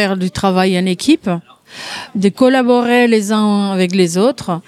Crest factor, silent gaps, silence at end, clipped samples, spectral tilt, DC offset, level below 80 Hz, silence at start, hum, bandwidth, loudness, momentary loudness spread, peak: 12 dB; none; 0.05 s; under 0.1%; -5.5 dB/octave; under 0.1%; -50 dBFS; 0 s; none; 13.5 kHz; -14 LUFS; 11 LU; 0 dBFS